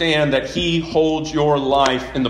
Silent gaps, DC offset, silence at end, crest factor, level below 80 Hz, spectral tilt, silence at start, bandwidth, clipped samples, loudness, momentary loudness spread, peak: none; under 0.1%; 0 s; 18 dB; -40 dBFS; -5 dB/octave; 0 s; 12 kHz; under 0.1%; -18 LUFS; 3 LU; 0 dBFS